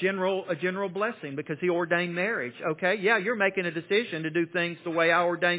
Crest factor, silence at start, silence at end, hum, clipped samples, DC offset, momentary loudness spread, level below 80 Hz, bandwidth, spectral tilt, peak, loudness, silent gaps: 18 dB; 0 s; 0 s; none; under 0.1%; under 0.1%; 7 LU; -80 dBFS; 4 kHz; -9 dB/octave; -8 dBFS; -27 LUFS; none